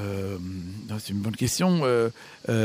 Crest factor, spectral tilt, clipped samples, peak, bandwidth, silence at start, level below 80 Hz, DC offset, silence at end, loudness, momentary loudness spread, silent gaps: 16 dB; -5.5 dB/octave; under 0.1%; -10 dBFS; 16 kHz; 0 s; -54 dBFS; under 0.1%; 0 s; -27 LUFS; 13 LU; none